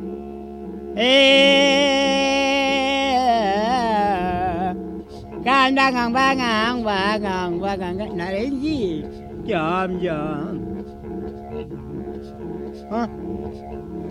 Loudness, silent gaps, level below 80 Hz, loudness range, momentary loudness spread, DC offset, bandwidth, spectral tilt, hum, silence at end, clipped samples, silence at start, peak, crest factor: -19 LUFS; none; -44 dBFS; 13 LU; 18 LU; under 0.1%; 12.5 kHz; -4.5 dB/octave; none; 0 s; under 0.1%; 0 s; -2 dBFS; 18 dB